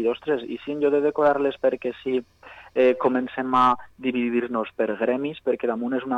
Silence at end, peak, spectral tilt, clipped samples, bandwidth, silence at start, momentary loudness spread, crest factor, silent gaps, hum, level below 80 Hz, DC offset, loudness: 0 s; -8 dBFS; -7 dB/octave; under 0.1%; 8 kHz; 0 s; 8 LU; 14 dB; none; none; -62 dBFS; under 0.1%; -24 LUFS